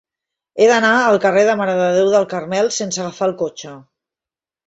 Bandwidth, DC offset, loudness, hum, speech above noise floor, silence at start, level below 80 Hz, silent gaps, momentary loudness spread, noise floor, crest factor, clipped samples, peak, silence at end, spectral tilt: 8 kHz; under 0.1%; -16 LUFS; none; 75 dB; 0.55 s; -64 dBFS; none; 12 LU; -90 dBFS; 14 dB; under 0.1%; -2 dBFS; 0.9 s; -4 dB/octave